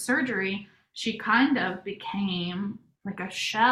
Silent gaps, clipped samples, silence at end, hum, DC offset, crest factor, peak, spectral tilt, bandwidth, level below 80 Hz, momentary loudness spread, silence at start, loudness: none; under 0.1%; 0 s; none; under 0.1%; 18 dB; -8 dBFS; -4 dB/octave; 14 kHz; -68 dBFS; 14 LU; 0 s; -28 LUFS